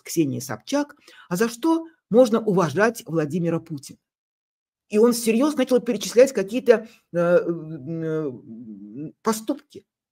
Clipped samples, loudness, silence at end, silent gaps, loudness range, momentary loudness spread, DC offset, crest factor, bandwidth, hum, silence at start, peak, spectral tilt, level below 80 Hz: under 0.1%; -22 LUFS; 0.35 s; 4.18-4.72 s; 4 LU; 15 LU; under 0.1%; 22 dB; 16 kHz; none; 0.05 s; -2 dBFS; -5.5 dB/octave; -70 dBFS